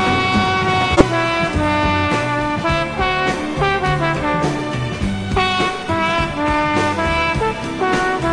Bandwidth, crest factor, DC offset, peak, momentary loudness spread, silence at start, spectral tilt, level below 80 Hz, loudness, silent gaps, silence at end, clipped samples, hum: 10.5 kHz; 18 dB; under 0.1%; 0 dBFS; 5 LU; 0 s; -5.5 dB/octave; -32 dBFS; -17 LUFS; none; 0 s; under 0.1%; none